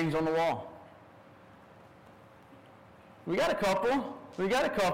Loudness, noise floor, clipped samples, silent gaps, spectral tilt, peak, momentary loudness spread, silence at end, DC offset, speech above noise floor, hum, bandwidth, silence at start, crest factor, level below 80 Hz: -30 LUFS; -55 dBFS; under 0.1%; none; -5 dB/octave; -24 dBFS; 16 LU; 0 s; under 0.1%; 26 dB; none; 16 kHz; 0 s; 10 dB; -60 dBFS